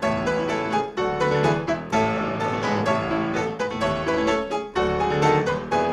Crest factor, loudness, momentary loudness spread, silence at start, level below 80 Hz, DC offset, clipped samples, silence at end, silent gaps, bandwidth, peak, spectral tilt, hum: 16 dB; -23 LUFS; 5 LU; 0 s; -46 dBFS; under 0.1%; under 0.1%; 0 s; none; 12 kHz; -6 dBFS; -6 dB/octave; none